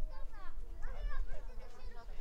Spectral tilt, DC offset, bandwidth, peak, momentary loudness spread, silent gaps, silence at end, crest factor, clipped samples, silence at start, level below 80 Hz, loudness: -6 dB/octave; under 0.1%; 5.6 kHz; -24 dBFS; 8 LU; none; 0 s; 12 dB; under 0.1%; 0 s; -40 dBFS; -50 LUFS